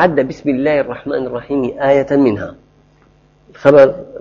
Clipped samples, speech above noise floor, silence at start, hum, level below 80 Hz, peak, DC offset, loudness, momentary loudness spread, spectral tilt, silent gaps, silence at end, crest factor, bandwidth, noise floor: 0.2%; 37 dB; 0 s; none; -48 dBFS; 0 dBFS; under 0.1%; -14 LUFS; 12 LU; -8 dB/octave; none; 0 s; 14 dB; 7 kHz; -50 dBFS